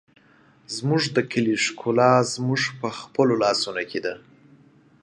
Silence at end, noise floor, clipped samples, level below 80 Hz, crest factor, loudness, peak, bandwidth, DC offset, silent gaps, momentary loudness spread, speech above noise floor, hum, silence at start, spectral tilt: 0.85 s; -56 dBFS; under 0.1%; -66 dBFS; 20 dB; -22 LUFS; -4 dBFS; 11.5 kHz; under 0.1%; none; 12 LU; 34 dB; none; 0.7 s; -4.5 dB/octave